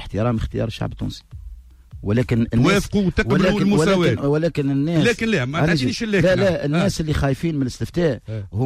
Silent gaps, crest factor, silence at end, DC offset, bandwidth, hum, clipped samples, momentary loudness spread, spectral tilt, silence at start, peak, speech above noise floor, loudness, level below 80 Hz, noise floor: none; 12 dB; 0 s; under 0.1%; 15 kHz; none; under 0.1%; 11 LU; -6.5 dB/octave; 0 s; -6 dBFS; 21 dB; -20 LUFS; -36 dBFS; -40 dBFS